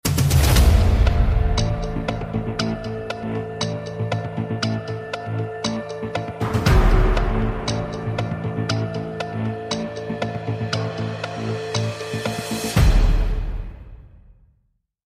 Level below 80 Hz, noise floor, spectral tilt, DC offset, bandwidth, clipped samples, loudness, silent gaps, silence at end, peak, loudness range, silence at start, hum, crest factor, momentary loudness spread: -24 dBFS; -67 dBFS; -5.5 dB/octave; under 0.1%; 15.5 kHz; under 0.1%; -23 LUFS; none; 1 s; -6 dBFS; 5 LU; 0.05 s; none; 16 dB; 10 LU